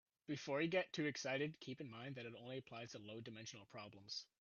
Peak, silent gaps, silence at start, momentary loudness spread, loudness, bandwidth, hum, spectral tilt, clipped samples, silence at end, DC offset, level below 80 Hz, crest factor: -28 dBFS; none; 0.3 s; 13 LU; -47 LUFS; 7.2 kHz; none; -3.5 dB/octave; under 0.1%; 0.15 s; under 0.1%; -86 dBFS; 20 dB